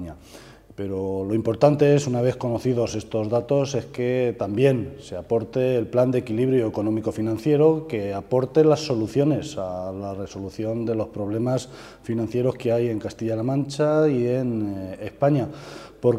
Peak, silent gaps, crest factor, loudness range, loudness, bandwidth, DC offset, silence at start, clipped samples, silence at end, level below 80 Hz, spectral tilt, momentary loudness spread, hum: -4 dBFS; none; 20 dB; 4 LU; -23 LUFS; 13.5 kHz; under 0.1%; 0 s; under 0.1%; 0 s; -54 dBFS; -7.5 dB/octave; 13 LU; none